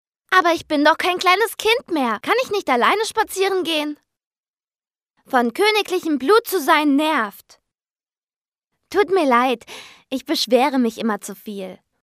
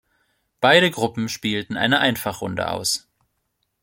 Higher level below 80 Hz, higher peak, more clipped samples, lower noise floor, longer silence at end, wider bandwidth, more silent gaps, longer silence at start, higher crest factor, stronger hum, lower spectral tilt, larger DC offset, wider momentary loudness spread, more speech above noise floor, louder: second, -64 dBFS vs -58 dBFS; about the same, 0 dBFS vs -2 dBFS; neither; first, under -90 dBFS vs -73 dBFS; second, 0.3 s vs 0.85 s; about the same, 15.5 kHz vs 16.5 kHz; first, 4.27-4.31 s, 4.38-4.43 s, 4.50-4.54 s, 8.23-8.27 s, 8.48-8.52 s vs none; second, 0.3 s vs 0.6 s; about the same, 20 dB vs 20 dB; neither; about the same, -2.5 dB/octave vs -3.5 dB/octave; neither; about the same, 13 LU vs 11 LU; first, over 71 dB vs 53 dB; about the same, -18 LUFS vs -20 LUFS